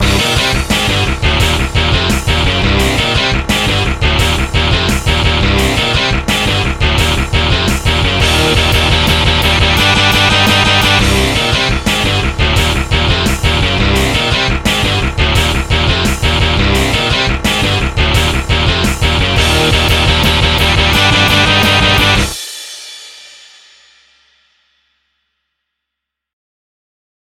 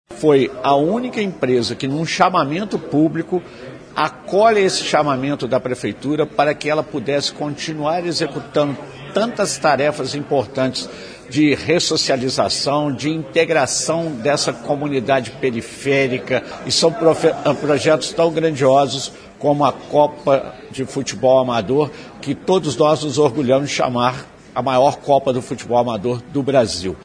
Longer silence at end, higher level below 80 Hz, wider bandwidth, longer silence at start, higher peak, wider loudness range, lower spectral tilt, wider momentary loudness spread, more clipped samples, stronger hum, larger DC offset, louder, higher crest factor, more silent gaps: first, 4.05 s vs 0 s; first, -18 dBFS vs -52 dBFS; first, 16.5 kHz vs 10.5 kHz; about the same, 0 s vs 0.1 s; about the same, 0 dBFS vs 0 dBFS; about the same, 3 LU vs 3 LU; about the same, -4 dB/octave vs -4.5 dB/octave; second, 5 LU vs 9 LU; neither; neither; neither; first, -11 LUFS vs -18 LUFS; second, 12 dB vs 18 dB; neither